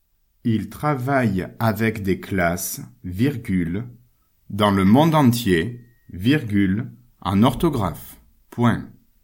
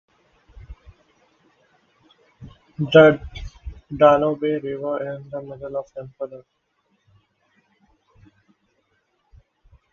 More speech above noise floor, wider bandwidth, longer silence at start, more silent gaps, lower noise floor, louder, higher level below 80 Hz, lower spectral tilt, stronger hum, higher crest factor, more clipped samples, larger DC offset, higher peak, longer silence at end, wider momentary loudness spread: second, 37 dB vs 50 dB; first, 17 kHz vs 6.8 kHz; second, 0.45 s vs 0.7 s; neither; second, -57 dBFS vs -69 dBFS; about the same, -21 LUFS vs -19 LUFS; about the same, -46 dBFS vs -46 dBFS; about the same, -6.5 dB/octave vs -7.5 dB/octave; neither; second, 18 dB vs 24 dB; neither; neither; about the same, -2 dBFS vs 0 dBFS; second, 0.35 s vs 3.5 s; second, 17 LU vs 25 LU